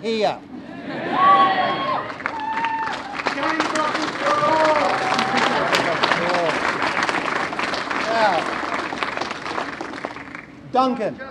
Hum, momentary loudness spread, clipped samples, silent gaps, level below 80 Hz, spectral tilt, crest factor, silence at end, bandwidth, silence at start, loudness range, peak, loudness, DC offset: none; 12 LU; under 0.1%; none; -58 dBFS; -3.5 dB/octave; 20 dB; 0 s; 14 kHz; 0 s; 4 LU; -2 dBFS; -20 LUFS; under 0.1%